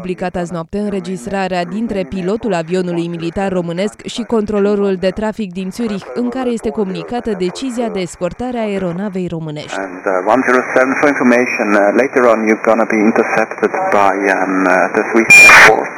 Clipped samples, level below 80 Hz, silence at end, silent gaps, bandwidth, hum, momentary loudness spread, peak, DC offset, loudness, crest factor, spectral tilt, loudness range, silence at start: 1%; -44 dBFS; 0 s; none; over 20 kHz; none; 10 LU; 0 dBFS; under 0.1%; -13 LUFS; 14 dB; -4.5 dB/octave; 8 LU; 0 s